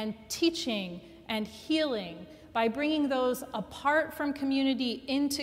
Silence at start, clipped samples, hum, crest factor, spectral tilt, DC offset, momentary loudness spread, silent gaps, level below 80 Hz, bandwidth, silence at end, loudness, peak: 0 s; under 0.1%; none; 16 dB; -4 dB/octave; under 0.1%; 8 LU; none; -62 dBFS; 16 kHz; 0 s; -30 LUFS; -14 dBFS